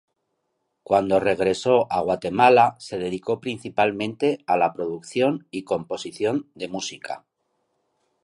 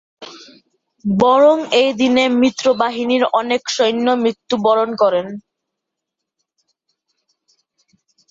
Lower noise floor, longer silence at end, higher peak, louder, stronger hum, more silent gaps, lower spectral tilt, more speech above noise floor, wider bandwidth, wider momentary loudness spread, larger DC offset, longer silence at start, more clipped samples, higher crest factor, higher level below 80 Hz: second, -76 dBFS vs -80 dBFS; second, 1.05 s vs 2.9 s; about the same, -2 dBFS vs -2 dBFS; second, -23 LUFS vs -15 LUFS; neither; neither; about the same, -5 dB/octave vs -4.5 dB/octave; second, 53 dB vs 65 dB; first, 11.5 kHz vs 7.8 kHz; about the same, 13 LU vs 15 LU; neither; first, 0.9 s vs 0.2 s; neither; first, 22 dB vs 16 dB; about the same, -60 dBFS vs -60 dBFS